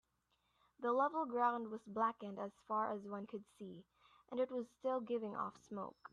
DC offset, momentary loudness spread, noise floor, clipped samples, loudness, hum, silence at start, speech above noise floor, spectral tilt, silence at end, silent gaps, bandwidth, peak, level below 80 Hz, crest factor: under 0.1%; 14 LU; -82 dBFS; under 0.1%; -41 LUFS; none; 0.8 s; 41 dB; -7 dB/octave; 0.2 s; none; 10.5 kHz; -24 dBFS; -86 dBFS; 18 dB